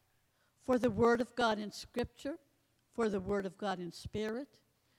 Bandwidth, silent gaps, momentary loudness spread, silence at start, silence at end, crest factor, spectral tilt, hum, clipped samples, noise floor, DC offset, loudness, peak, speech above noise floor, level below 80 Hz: 16.5 kHz; none; 15 LU; 0.7 s; 0.55 s; 18 dB; -5.5 dB/octave; none; under 0.1%; -75 dBFS; under 0.1%; -36 LUFS; -18 dBFS; 40 dB; -62 dBFS